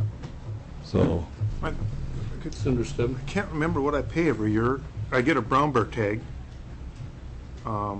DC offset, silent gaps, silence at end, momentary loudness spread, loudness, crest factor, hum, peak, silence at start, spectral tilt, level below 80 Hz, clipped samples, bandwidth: under 0.1%; none; 0 s; 17 LU; -27 LUFS; 14 dB; none; -12 dBFS; 0 s; -7 dB/octave; -38 dBFS; under 0.1%; 8.6 kHz